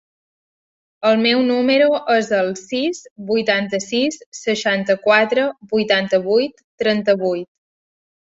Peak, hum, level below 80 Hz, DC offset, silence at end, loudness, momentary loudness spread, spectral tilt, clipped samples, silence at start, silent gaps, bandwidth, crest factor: -2 dBFS; none; -64 dBFS; under 0.1%; 0.8 s; -18 LUFS; 8 LU; -4 dB/octave; under 0.1%; 1 s; 3.11-3.16 s, 4.26-4.32 s, 6.64-6.78 s; 8 kHz; 16 dB